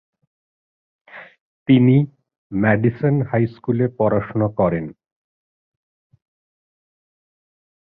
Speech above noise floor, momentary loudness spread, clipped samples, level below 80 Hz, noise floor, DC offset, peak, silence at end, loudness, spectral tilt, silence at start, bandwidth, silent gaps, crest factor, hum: over 73 dB; 13 LU; under 0.1%; -52 dBFS; under -90 dBFS; under 0.1%; -2 dBFS; 2.9 s; -19 LUFS; -12 dB/octave; 1.15 s; 4.5 kHz; 1.41-1.66 s, 2.38-2.50 s; 18 dB; none